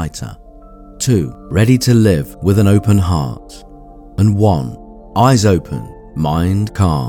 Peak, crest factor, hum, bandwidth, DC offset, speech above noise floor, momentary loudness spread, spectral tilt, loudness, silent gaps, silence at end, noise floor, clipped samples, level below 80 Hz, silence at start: 0 dBFS; 14 dB; none; 17 kHz; under 0.1%; 24 dB; 16 LU; -6.5 dB/octave; -14 LUFS; none; 0 s; -37 dBFS; under 0.1%; -34 dBFS; 0 s